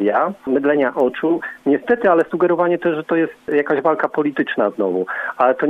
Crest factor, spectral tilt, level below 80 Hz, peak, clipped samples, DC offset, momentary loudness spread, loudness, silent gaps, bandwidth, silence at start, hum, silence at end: 14 dB; -8 dB/octave; -62 dBFS; -2 dBFS; under 0.1%; under 0.1%; 4 LU; -18 LUFS; none; 4.7 kHz; 0 s; none; 0 s